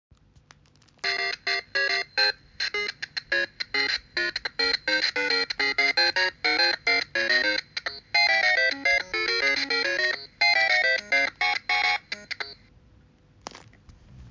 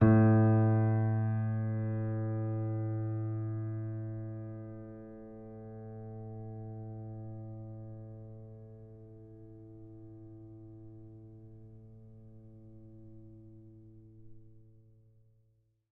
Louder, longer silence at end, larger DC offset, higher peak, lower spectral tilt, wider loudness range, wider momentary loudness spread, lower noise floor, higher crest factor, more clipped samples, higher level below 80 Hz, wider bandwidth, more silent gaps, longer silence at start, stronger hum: first, -23 LUFS vs -33 LUFS; second, 0 s vs 1.3 s; neither; about the same, -10 dBFS vs -12 dBFS; second, -1 dB/octave vs -12 dB/octave; second, 5 LU vs 22 LU; second, 10 LU vs 26 LU; second, -59 dBFS vs -72 dBFS; second, 16 dB vs 22 dB; neither; about the same, -60 dBFS vs -62 dBFS; first, 7.6 kHz vs 2.7 kHz; neither; first, 1.05 s vs 0 s; neither